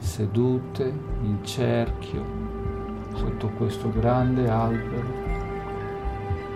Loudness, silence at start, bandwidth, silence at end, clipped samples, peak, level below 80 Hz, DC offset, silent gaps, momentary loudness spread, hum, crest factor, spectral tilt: -27 LUFS; 0 s; 14 kHz; 0 s; under 0.1%; -12 dBFS; -36 dBFS; 0.1%; none; 9 LU; none; 14 dB; -7.5 dB/octave